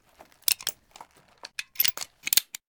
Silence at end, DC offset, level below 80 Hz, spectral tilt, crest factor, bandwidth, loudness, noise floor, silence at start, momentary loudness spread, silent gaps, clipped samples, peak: 0.25 s; under 0.1%; -72 dBFS; 2.5 dB/octave; 30 dB; over 20 kHz; -25 LUFS; -52 dBFS; 0.5 s; 15 LU; none; under 0.1%; 0 dBFS